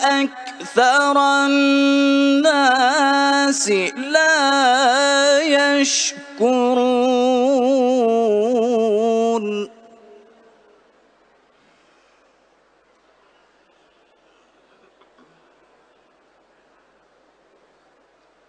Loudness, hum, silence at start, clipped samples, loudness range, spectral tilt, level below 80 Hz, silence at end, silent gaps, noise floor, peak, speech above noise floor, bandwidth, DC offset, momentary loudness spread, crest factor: -16 LUFS; none; 0 s; under 0.1%; 8 LU; -2 dB/octave; -74 dBFS; 8.8 s; none; -58 dBFS; -2 dBFS; 42 dB; 10.5 kHz; under 0.1%; 6 LU; 16 dB